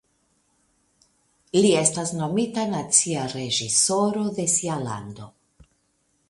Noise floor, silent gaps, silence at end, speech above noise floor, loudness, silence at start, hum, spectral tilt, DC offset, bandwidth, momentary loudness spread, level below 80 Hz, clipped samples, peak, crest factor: -69 dBFS; none; 1 s; 46 dB; -22 LUFS; 1.55 s; none; -3.5 dB/octave; under 0.1%; 11.5 kHz; 11 LU; -62 dBFS; under 0.1%; -4 dBFS; 22 dB